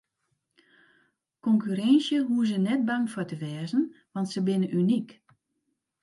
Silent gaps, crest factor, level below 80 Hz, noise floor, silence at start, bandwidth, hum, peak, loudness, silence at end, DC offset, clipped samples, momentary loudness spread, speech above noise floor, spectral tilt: none; 16 dB; -78 dBFS; -79 dBFS; 1.45 s; 11.5 kHz; none; -10 dBFS; -27 LUFS; 0.9 s; under 0.1%; under 0.1%; 11 LU; 53 dB; -6.5 dB/octave